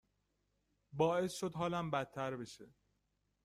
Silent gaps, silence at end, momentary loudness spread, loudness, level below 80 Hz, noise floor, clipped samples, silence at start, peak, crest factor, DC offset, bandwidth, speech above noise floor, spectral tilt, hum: none; 0.75 s; 17 LU; -38 LUFS; -72 dBFS; -82 dBFS; under 0.1%; 0.95 s; -20 dBFS; 22 dB; under 0.1%; 15.5 kHz; 44 dB; -5.5 dB/octave; 50 Hz at -70 dBFS